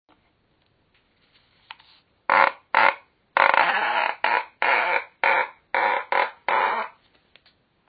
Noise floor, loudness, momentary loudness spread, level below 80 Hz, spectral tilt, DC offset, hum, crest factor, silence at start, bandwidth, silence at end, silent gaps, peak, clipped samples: -66 dBFS; -21 LUFS; 8 LU; -76 dBFS; -5 dB/octave; under 0.1%; none; 24 dB; 2.3 s; 5 kHz; 1.05 s; none; 0 dBFS; under 0.1%